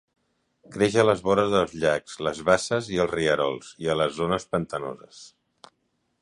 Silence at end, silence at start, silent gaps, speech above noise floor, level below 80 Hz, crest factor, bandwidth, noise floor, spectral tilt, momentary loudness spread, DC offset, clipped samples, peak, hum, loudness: 0.95 s; 0.7 s; none; 49 dB; -54 dBFS; 22 dB; 11.5 kHz; -73 dBFS; -5 dB/octave; 11 LU; under 0.1%; under 0.1%; -4 dBFS; none; -24 LUFS